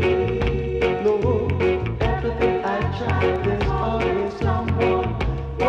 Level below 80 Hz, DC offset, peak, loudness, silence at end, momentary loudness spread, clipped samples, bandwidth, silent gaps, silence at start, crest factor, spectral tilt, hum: -32 dBFS; under 0.1%; -10 dBFS; -22 LUFS; 0 s; 3 LU; under 0.1%; 8.2 kHz; none; 0 s; 12 dB; -8 dB/octave; none